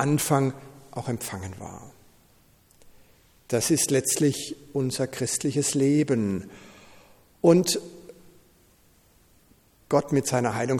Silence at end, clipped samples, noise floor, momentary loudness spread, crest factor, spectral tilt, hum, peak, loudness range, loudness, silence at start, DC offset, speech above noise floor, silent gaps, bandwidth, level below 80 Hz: 0 s; under 0.1%; -59 dBFS; 17 LU; 20 dB; -5 dB/octave; none; -6 dBFS; 6 LU; -25 LUFS; 0 s; under 0.1%; 35 dB; none; 19 kHz; -62 dBFS